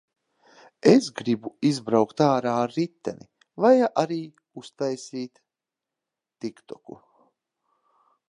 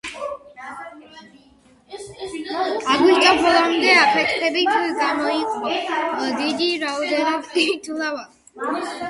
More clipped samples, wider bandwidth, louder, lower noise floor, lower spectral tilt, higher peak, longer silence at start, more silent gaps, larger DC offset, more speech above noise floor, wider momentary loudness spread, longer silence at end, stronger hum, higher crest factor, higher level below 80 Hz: neither; about the same, 11 kHz vs 11.5 kHz; second, -23 LUFS vs -19 LUFS; first, -88 dBFS vs -53 dBFS; first, -6 dB/octave vs -2.5 dB/octave; about the same, -2 dBFS vs -2 dBFS; first, 0.85 s vs 0.05 s; neither; neither; first, 65 dB vs 34 dB; about the same, 23 LU vs 21 LU; first, 1.4 s vs 0 s; neither; about the same, 22 dB vs 20 dB; second, -72 dBFS vs -60 dBFS